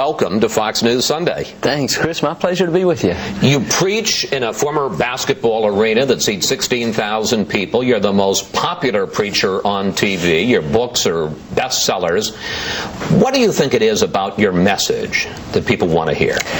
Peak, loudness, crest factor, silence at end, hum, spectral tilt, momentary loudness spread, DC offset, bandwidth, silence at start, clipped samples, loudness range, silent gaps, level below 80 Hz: 0 dBFS; -16 LUFS; 16 dB; 0 s; none; -4 dB/octave; 5 LU; under 0.1%; 19.5 kHz; 0 s; under 0.1%; 1 LU; none; -44 dBFS